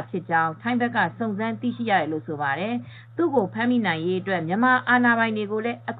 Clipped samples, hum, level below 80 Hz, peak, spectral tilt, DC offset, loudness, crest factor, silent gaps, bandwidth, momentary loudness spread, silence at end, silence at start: under 0.1%; none; -72 dBFS; -8 dBFS; -9 dB/octave; under 0.1%; -23 LUFS; 16 dB; none; 4.6 kHz; 9 LU; 0 s; 0 s